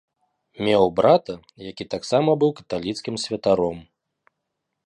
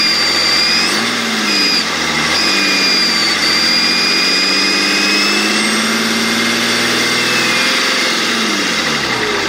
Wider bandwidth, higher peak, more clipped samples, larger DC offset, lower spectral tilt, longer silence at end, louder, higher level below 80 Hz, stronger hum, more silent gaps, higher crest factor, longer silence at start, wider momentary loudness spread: second, 11.5 kHz vs 16.5 kHz; second, -4 dBFS vs 0 dBFS; neither; neither; first, -5.5 dB/octave vs -1.5 dB/octave; first, 1.05 s vs 0 s; second, -21 LUFS vs -11 LUFS; second, -56 dBFS vs -50 dBFS; neither; neither; first, 20 dB vs 12 dB; first, 0.6 s vs 0 s; first, 18 LU vs 4 LU